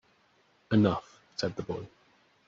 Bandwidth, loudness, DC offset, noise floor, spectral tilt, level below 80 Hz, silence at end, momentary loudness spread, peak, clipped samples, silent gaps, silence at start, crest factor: 7.4 kHz; -31 LUFS; under 0.1%; -67 dBFS; -6 dB/octave; -64 dBFS; 0.6 s; 15 LU; -12 dBFS; under 0.1%; none; 0.7 s; 20 dB